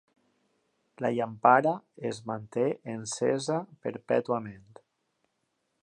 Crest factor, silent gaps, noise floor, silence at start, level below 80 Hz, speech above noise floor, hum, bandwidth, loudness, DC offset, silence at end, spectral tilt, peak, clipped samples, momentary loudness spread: 24 dB; none; -78 dBFS; 1 s; -74 dBFS; 50 dB; none; 11.5 kHz; -29 LUFS; under 0.1%; 1.25 s; -5 dB/octave; -6 dBFS; under 0.1%; 14 LU